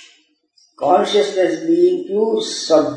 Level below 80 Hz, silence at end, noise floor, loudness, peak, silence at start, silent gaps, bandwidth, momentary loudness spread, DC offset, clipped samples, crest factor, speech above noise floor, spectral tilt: -74 dBFS; 0 s; -58 dBFS; -16 LUFS; 0 dBFS; 0.8 s; none; 10 kHz; 4 LU; under 0.1%; under 0.1%; 16 dB; 42 dB; -4 dB/octave